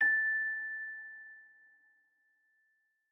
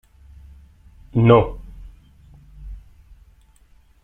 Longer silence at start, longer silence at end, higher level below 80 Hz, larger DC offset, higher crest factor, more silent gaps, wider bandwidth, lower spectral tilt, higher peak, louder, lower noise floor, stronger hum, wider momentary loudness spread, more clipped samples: second, 0 s vs 1.15 s; first, 1.65 s vs 1.25 s; second, under -90 dBFS vs -40 dBFS; neither; second, 16 dB vs 22 dB; neither; first, 5.6 kHz vs 3.8 kHz; second, -3 dB/octave vs -10 dB/octave; second, -22 dBFS vs -2 dBFS; second, -33 LUFS vs -17 LUFS; first, -77 dBFS vs -53 dBFS; neither; second, 23 LU vs 27 LU; neither